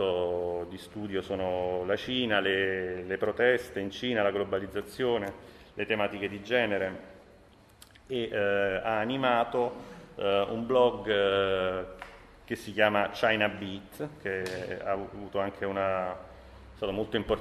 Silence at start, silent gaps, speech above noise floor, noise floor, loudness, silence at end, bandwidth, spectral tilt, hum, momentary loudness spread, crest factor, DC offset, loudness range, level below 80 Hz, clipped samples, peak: 0 s; none; 27 dB; -57 dBFS; -30 LUFS; 0 s; 13.5 kHz; -5.5 dB/octave; none; 13 LU; 22 dB; under 0.1%; 5 LU; -56 dBFS; under 0.1%; -10 dBFS